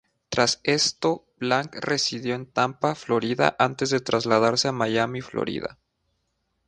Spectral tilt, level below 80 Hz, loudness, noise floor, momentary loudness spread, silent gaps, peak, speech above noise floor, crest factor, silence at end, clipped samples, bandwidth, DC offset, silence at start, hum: -3.5 dB/octave; -60 dBFS; -24 LUFS; -74 dBFS; 8 LU; none; -2 dBFS; 50 dB; 22 dB; 1 s; under 0.1%; 10.5 kHz; under 0.1%; 0.3 s; none